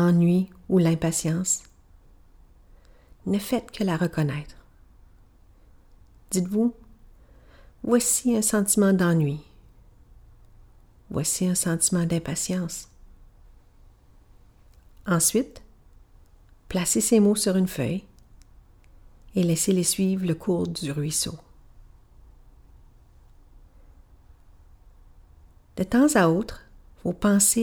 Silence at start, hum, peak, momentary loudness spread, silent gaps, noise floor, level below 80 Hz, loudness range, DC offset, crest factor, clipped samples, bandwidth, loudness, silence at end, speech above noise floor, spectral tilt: 0 s; none; -8 dBFS; 14 LU; none; -54 dBFS; -50 dBFS; 7 LU; under 0.1%; 18 dB; under 0.1%; 18 kHz; -24 LUFS; 0 s; 31 dB; -5 dB/octave